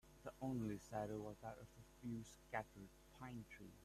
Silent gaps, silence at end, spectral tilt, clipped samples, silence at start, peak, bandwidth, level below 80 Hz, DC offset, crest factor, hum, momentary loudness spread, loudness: none; 0 s; -6.5 dB/octave; under 0.1%; 0.05 s; -30 dBFS; 14 kHz; -70 dBFS; under 0.1%; 22 dB; none; 13 LU; -51 LUFS